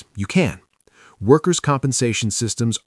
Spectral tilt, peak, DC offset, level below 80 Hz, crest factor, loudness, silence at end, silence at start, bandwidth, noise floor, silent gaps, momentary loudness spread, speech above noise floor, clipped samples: -5 dB/octave; 0 dBFS; under 0.1%; -54 dBFS; 20 dB; -19 LUFS; 0.1 s; 0.15 s; 12 kHz; -52 dBFS; none; 6 LU; 34 dB; under 0.1%